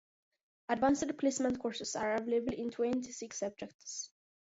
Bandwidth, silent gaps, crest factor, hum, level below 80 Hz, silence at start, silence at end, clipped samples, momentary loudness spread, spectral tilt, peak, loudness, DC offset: 7.6 kHz; 3.74-3.79 s; 18 dB; none; -66 dBFS; 0.7 s; 0.45 s; under 0.1%; 12 LU; -3.5 dB/octave; -18 dBFS; -35 LUFS; under 0.1%